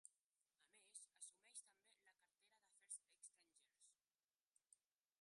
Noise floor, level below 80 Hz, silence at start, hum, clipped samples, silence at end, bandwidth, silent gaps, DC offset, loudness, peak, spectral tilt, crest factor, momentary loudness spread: under -90 dBFS; under -90 dBFS; 0.05 s; none; under 0.1%; 0.45 s; 11.5 kHz; 0.26-0.30 s, 4.24-4.28 s, 4.35-4.39 s, 4.47-4.51 s; under 0.1%; -61 LUFS; -42 dBFS; 3 dB/octave; 26 dB; 8 LU